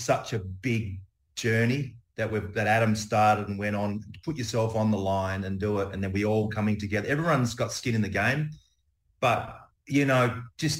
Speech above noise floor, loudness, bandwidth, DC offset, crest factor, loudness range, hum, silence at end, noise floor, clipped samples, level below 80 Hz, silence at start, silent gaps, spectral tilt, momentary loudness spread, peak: 44 dB; -27 LUFS; 16 kHz; under 0.1%; 18 dB; 2 LU; none; 0 s; -70 dBFS; under 0.1%; -58 dBFS; 0 s; none; -5.5 dB/octave; 10 LU; -10 dBFS